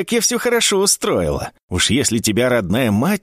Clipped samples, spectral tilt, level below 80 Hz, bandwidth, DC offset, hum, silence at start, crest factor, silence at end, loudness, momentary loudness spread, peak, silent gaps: under 0.1%; -3.5 dB/octave; -40 dBFS; 15.5 kHz; under 0.1%; none; 0 s; 16 dB; 0.05 s; -16 LUFS; 6 LU; -2 dBFS; 1.63-1.68 s